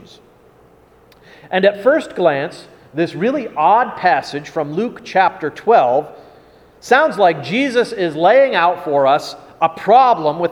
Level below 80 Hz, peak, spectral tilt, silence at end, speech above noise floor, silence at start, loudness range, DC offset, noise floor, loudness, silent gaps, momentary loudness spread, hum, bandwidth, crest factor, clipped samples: -60 dBFS; 0 dBFS; -5.5 dB/octave; 0 s; 33 dB; 1.45 s; 4 LU; under 0.1%; -48 dBFS; -15 LUFS; none; 10 LU; none; 13.5 kHz; 16 dB; under 0.1%